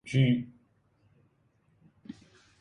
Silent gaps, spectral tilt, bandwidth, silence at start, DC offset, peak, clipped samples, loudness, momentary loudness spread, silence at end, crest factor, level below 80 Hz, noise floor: none; -7.5 dB/octave; 10 kHz; 0.05 s; under 0.1%; -14 dBFS; under 0.1%; -27 LUFS; 25 LU; 0.5 s; 20 dB; -66 dBFS; -69 dBFS